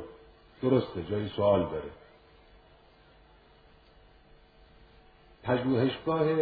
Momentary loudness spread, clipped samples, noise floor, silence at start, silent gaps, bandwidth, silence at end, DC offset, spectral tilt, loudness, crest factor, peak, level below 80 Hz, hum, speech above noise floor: 14 LU; under 0.1%; -59 dBFS; 0 s; none; 4.9 kHz; 0 s; under 0.1%; -10.5 dB/octave; -29 LUFS; 20 dB; -12 dBFS; -58 dBFS; none; 31 dB